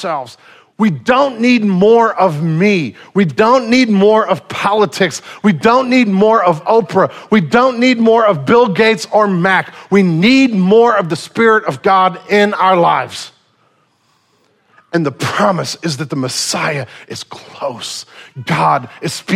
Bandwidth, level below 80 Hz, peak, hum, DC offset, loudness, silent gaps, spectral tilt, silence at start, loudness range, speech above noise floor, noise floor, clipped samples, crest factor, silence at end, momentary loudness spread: 15 kHz; -54 dBFS; 0 dBFS; none; under 0.1%; -12 LUFS; none; -5.5 dB/octave; 0 s; 7 LU; 45 dB; -57 dBFS; under 0.1%; 12 dB; 0 s; 13 LU